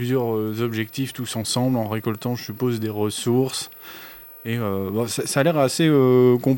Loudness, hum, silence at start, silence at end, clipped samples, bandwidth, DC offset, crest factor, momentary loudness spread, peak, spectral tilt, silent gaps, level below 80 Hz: -22 LUFS; none; 0 s; 0 s; under 0.1%; 17 kHz; under 0.1%; 18 dB; 13 LU; -4 dBFS; -5.5 dB/octave; none; -64 dBFS